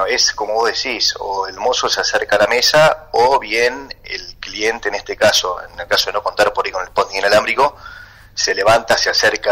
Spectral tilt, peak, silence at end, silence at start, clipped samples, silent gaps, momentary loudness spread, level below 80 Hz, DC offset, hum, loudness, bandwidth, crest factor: -1.5 dB/octave; -4 dBFS; 0 s; 0 s; under 0.1%; none; 14 LU; -44 dBFS; under 0.1%; none; -15 LUFS; 16 kHz; 12 dB